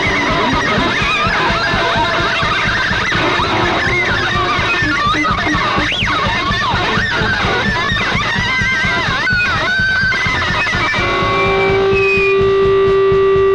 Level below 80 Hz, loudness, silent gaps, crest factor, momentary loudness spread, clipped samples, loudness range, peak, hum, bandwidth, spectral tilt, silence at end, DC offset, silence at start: -30 dBFS; -13 LUFS; none; 8 dB; 2 LU; under 0.1%; 1 LU; -4 dBFS; none; 10.5 kHz; -4.5 dB/octave; 0 s; under 0.1%; 0 s